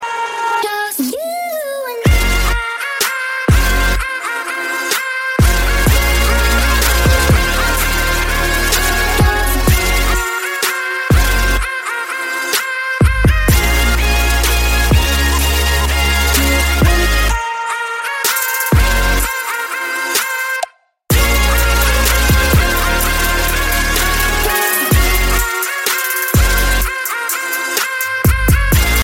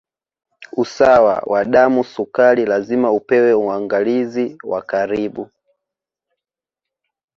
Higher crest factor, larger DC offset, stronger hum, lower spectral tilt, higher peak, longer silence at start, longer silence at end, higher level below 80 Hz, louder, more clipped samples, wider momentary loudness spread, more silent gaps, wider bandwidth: about the same, 14 dB vs 16 dB; neither; neither; second, -3.5 dB/octave vs -6.5 dB/octave; about the same, 0 dBFS vs 0 dBFS; second, 0 s vs 0.6 s; second, 0 s vs 1.9 s; first, -18 dBFS vs -56 dBFS; about the same, -14 LUFS vs -16 LUFS; neither; second, 6 LU vs 10 LU; neither; first, 17 kHz vs 7.4 kHz